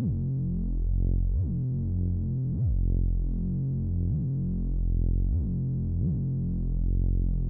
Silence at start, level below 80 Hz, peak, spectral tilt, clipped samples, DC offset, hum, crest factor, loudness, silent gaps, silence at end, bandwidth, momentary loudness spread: 0 s; -30 dBFS; -16 dBFS; -15 dB/octave; under 0.1%; under 0.1%; none; 10 dB; -29 LUFS; none; 0 s; 1 kHz; 2 LU